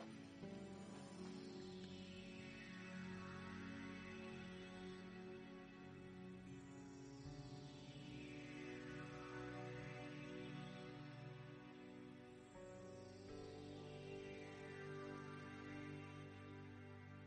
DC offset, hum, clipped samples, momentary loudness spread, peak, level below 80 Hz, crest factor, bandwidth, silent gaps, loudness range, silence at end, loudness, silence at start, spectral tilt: under 0.1%; none; under 0.1%; 5 LU; -40 dBFS; -76 dBFS; 14 dB; 10 kHz; none; 3 LU; 0 s; -55 LUFS; 0 s; -6 dB/octave